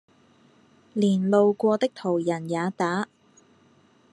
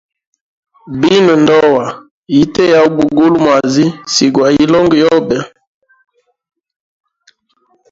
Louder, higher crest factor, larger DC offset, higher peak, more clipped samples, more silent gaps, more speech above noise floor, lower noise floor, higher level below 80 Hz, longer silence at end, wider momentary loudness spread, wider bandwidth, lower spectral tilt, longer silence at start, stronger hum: second, -24 LUFS vs -10 LUFS; first, 18 dB vs 12 dB; neither; second, -6 dBFS vs 0 dBFS; neither; second, none vs 2.11-2.23 s; second, 36 dB vs 48 dB; about the same, -59 dBFS vs -58 dBFS; second, -76 dBFS vs -48 dBFS; second, 1.1 s vs 2.45 s; about the same, 9 LU vs 10 LU; first, 10.5 kHz vs 7.8 kHz; first, -7 dB/octave vs -5 dB/octave; about the same, 0.95 s vs 0.85 s; neither